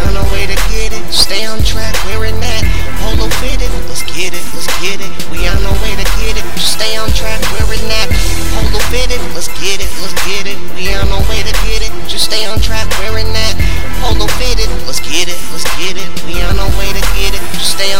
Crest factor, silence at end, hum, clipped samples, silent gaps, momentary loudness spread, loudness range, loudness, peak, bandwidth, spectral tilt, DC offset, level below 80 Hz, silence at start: 18 dB; 0 s; none; 3%; none; 5 LU; 2 LU; -15 LUFS; 0 dBFS; 16.5 kHz; -3 dB/octave; 60%; -18 dBFS; 0 s